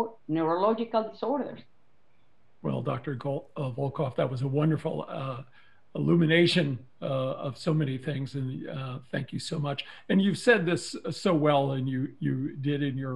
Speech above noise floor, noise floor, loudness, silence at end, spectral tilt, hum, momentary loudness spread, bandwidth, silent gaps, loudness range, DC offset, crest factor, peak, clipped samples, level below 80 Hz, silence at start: 41 dB; -69 dBFS; -29 LUFS; 0 s; -6.5 dB/octave; none; 12 LU; 11.5 kHz; none; 5 LU; 0.2%; 22 dB; -6 dBFS; under 0.1%; -70 dBFS; 0 s